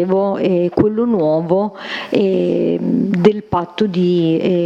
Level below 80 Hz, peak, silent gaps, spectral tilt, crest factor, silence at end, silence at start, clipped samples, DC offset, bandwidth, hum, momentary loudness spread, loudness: -50 dBFS; 0 dBFS; none; -8.5 dB/octave; 16 dB; 0 s; 0 s; under 0.1%; under 0.1%; 7.6 kHz; none; 5 LU; -16 LUFS